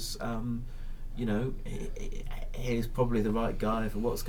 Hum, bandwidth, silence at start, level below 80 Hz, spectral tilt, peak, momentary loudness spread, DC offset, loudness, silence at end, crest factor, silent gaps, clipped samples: none; 17.5 kHz; 0 s; -36 dBFS; -6 dB/octave; -14 dBFS; 13 LU; under 0.1%; -34 LUFS; 0 s; 18 dB; none; under 0.1%